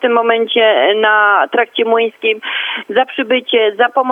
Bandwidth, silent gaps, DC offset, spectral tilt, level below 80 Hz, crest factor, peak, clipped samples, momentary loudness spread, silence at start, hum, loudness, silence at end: 3.8 kHz; none; under 0.1%; -4.5 dB/octave; -76 dBFS; 12 dB; 0 dBFS; under 0.1%; 6 LU; 0 s; none; -13 LUFS; 0 s